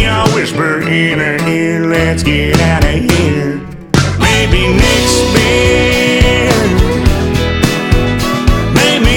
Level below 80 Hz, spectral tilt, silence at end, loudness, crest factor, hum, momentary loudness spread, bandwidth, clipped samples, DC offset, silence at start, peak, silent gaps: -18 dBFS; -5 dB/octave; 0 s; -11 LUFS; 10 dB; none; 4 LU; 18 kHz; 0.4%; under 0.1%; 0 s; 0 dBFS; none